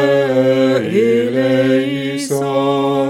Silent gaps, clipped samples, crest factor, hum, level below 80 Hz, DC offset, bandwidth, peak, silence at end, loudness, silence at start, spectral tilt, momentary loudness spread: none; under 0.1%; 12 dB; none; -60 dBFS; under 0.1%; 15 kHz; -2 dBFS; 0 s; -15 LUFS; 0 s; -6 dB/octave; 6 LU